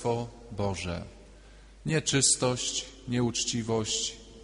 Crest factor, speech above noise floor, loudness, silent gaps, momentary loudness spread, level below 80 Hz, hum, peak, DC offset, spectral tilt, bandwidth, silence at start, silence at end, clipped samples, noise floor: 20 dB; 22 dB; -28 LUFS; none; 15 LU; -52 dBFS; none; -10 dBFS; under 0.1%; -3 dB/octave; 10.5 kHz; 0 s; 0 s; under 0.1%; -51 dBFS